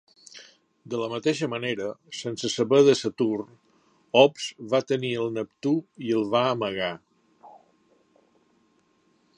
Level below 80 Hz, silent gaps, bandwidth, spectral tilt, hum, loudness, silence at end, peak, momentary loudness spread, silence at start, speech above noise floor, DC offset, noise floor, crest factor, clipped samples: -70 dBFS; none; 10 kHz; -5 dB/octave; none; -25 LUFS; 1.9 s; -4 dBFS; 15 LU; 0.35 s; 41 dB; under 0.1%; -66 dBFS; 24 dB; under 0.1%